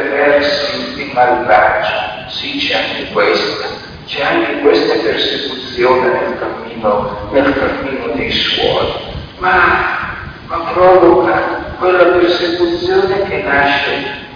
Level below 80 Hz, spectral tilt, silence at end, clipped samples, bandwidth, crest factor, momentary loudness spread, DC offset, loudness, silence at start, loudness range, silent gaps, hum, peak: -38 dBFS; -5.5 dB/octave; 0 s; under 0.1%; 5.2 kHz; 14 dB; 11 LU; under 0.1%; -13 LUFS; 0 s; 3 LU; none; none; 0 dBFS